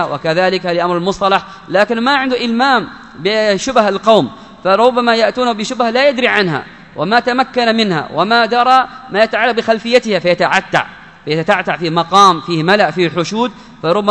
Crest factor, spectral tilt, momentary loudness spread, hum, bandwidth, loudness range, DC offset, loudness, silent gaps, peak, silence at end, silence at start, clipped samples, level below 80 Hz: 14 dB; -4.5 dB/octave; 8 LU; none; 11 kHz; 1 LU; 0.2%; -13 LUFS; none; 0 dBFS; 0 s; 0 s; 0.3%; -50 dBFS